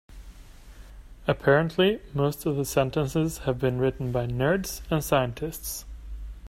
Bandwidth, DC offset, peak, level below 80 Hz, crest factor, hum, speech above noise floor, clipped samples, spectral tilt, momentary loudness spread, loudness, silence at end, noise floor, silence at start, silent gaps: 16 kHz; under 0.1%; -6 dBFS; -44 dBFS; 20 dB; none; 21 dB; under 0.1%; -5.5 dB/octave; 12 LU; -26 LUFS; 0.05 s; -46 dBFS; 0.1 s; none